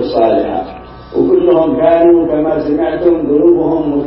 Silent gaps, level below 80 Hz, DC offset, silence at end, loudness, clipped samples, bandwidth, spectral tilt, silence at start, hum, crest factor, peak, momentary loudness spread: none; -38 dBFS; under 0.1%; 0 s; -11 LUFS; under 0.1%; 5.6 kHz; -11.5 dB/octave; 0 s; none; 10 dB; 0 dBFS; 11 LU